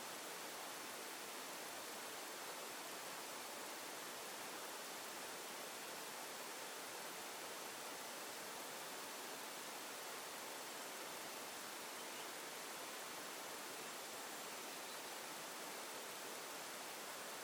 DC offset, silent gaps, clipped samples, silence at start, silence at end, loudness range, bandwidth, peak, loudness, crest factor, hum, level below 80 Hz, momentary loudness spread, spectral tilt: under 0.1%; none; under 0.1%; 0 s; 0 s; 0 LU; over 20 kHz; -36 dBFS; -48 LUFS; 14 dB; none; under -90 dBFS; 0 LU; -0.5 dB/octave